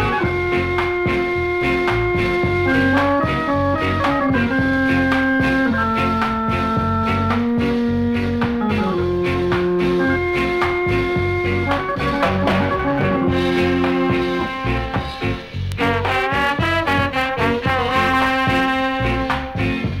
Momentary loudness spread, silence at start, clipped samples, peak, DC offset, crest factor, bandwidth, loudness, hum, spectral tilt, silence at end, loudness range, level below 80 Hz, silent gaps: 4 LU; 0 s; under 0.1%; -2 dBFS; under 0.1%; 16 dB; 15 kHz; -18 LUFS; none; -7 dB/octave; 0 s; 2 LU; -34 dBFS; none